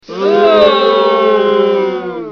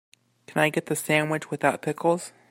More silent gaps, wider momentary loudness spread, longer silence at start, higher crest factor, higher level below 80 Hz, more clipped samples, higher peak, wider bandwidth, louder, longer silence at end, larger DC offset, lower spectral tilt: neither; about the same, 7 LU vs 5 LU; second, 0.1 s vs 0.5 s; second, 10 dB vs 20 dB; first, -52 dBFS vs -70 dBFS; neither; first, 0 dBFS vs -6 dBFS; second, 6.4 kHz vs 16 kHz; first, -10 LUFS vs -25 LUFS; second, 0 s vs 0.2 s; neither; first, -6 dB/octave vs -4.5 dB/octave